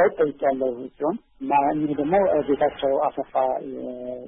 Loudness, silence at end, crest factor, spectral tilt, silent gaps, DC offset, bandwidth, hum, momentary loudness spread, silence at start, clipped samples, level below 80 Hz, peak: -24 LUFS; 0 s; 14 dB; -11 dB/octave; none; under 0.1%; 3.8 kHz; none; 10 LU; 0 s; under 0.1%; -56 dBFS; -8 dBFS